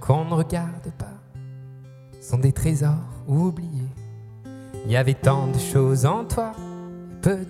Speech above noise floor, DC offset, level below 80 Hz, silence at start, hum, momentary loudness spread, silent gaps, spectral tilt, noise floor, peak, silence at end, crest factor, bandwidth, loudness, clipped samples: 22 dB; under 0.1%; -44 dBFS; 0 s; none; 20 LU; none; -7 dB/octave; -43 dBFS; -4 dBFS; 0 s; 20 dB; 15 kHz; -23 LUFS; under 0.1%